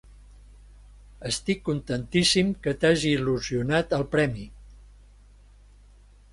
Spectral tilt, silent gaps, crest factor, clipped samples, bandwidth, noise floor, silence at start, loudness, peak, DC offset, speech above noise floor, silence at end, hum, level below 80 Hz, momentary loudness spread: -4.5 dB/octave; none; 20 dB; under 0.1%; 11.5 kHz; -53 dBFS; 1.2 s; -25 LUFS; -6 dBFS; under 0.1%; 28 dB; 1.6 s; 50 Hz at -45 dBFS; -48 dBFS; 9 LU